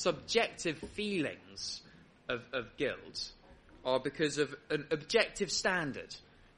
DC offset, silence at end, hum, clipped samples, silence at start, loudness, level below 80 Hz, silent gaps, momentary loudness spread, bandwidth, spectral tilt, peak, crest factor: under 0.1%; 0.35 s; none; under 0.1%; 0 s; -35 LUFS; -64 dBFS; none; 11 LU; 11 kHz; -3 dB/octave; -12 dBFS; 24 dB